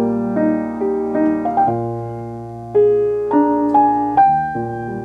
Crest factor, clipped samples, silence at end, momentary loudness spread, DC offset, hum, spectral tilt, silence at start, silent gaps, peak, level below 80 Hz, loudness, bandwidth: 14 dB; under 0.1%; 0 s; 11 LU; under 0.1%; none; -10 dB/octave; 0 s; none; -2 dBFS; -48 dBFS; -17 LUFS; 4.9 kHz